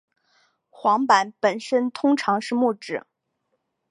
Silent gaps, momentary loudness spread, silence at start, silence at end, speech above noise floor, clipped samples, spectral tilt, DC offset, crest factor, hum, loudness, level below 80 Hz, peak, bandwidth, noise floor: none; 10 LU; 0.8 s; 0.9 s; 54 dB; under 0.1%; -4.5 dB/octave; under 0.1%; 20 dB; none; -22 LUFS; -78 dBFS; -4 dBFS; 11 kHz; -75 dBFS